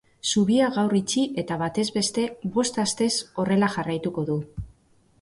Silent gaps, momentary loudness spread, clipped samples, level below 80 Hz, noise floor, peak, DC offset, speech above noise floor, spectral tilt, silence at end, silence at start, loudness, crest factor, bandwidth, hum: none; 7 LU; under 0.1%; -54 dBFS; -60 dBFS; -10 dBFS; under 0.1%; 37 dB; -4.5 dB/octave; 0.5 s; 0.25 s; -24 LUFS; 14 dB; 11.5 kHz; none